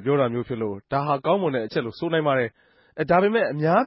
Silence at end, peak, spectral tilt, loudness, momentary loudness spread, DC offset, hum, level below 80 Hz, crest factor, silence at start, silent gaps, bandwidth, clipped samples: 0 s; -6 dBFS; -11 dB/octave; -23 LUFS; 9 LU; under 0.1%; none; -58 dBFS; 16 dB; 0 s; none; 5.8 kHz; under 0.1%